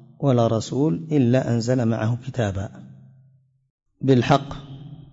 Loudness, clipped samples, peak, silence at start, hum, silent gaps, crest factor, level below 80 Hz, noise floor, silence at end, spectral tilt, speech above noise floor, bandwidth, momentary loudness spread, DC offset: -21 LUFS; under 0.1%; -6 dBFS; 0.2 s; none; 3.70-3.78 s; 16 dB; -52 dBFS; -58 dBFS; 0.1 s; -7.5 dB/octave; 37 dB; 7.8 kHz; 17 LU; under 0.1%